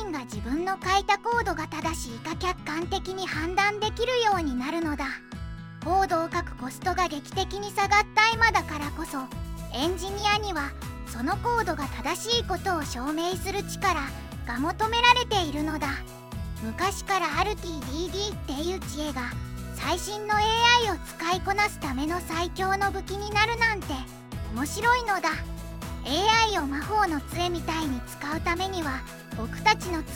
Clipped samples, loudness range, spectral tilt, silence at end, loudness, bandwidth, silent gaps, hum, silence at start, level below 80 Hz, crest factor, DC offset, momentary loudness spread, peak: under 0.1%; 4 LU; -3.5 dB/octave; 0 s; -27 LUFS; 17 kHz; none; none; 0 s; -40 dBFS; 22 dB; under 0.1%; 13 LU; -4 dBFS